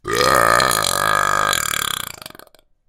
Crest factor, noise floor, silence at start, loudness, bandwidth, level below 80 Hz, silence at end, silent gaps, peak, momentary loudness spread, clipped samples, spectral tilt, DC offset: 18 dB; -48 dBFS; 0.05 s; -16 LUFS; 17 kHz; -44 dBFS; 0.85 s; none; 0 dBFS; 12 LU; under 0.1%; -1.5 dB/octave; under 0.1%